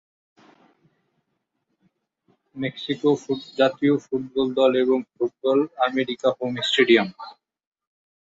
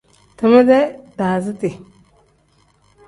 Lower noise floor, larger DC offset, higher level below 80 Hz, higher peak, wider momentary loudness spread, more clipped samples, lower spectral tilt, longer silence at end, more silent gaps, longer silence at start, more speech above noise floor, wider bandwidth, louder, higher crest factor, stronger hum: first, -76 dBFS vs -57 dBFS; neither; second, -68 dBFS vs -56 dBFS; about the same, -4 dBFS vs -2 dBFS; second, 11 LU vs 14 LU; neither; second, -5.5 dB/octave vs -7.5 dB/octave; second, 0.95 s vs 1.3 s; neither; first, 2.55 s vs 0.4 s; first, 55 dB vs 43 dB; second, 8 kHz vs 11.5 kHz; second, -22 LUFS vs -16 LUFS; about the same, 20 dB vs 16 dB; second, none vs 50 Hz at -55 dBFS